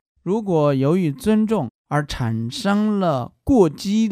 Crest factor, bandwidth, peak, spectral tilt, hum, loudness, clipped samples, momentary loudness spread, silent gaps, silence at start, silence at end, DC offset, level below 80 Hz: 18 dB; 14.5 kHz; -2 dBFS; -7 dB/octave; none; -20 LUFS; under 0.1%; 7 LU; 1.70-1.84 s; 0.25 s; 0 s; under 0.1%; -42 dBFS